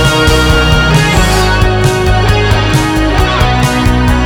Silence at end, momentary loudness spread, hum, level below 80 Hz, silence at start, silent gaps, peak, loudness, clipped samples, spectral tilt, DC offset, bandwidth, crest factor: 0 s; 2 LU; none; -14 dBFS; 0 s; none; 0 dBFS; -9 LUFS; under 0.1%; -5 dB/octave; under 0.1%; 19 kHz; 8 dB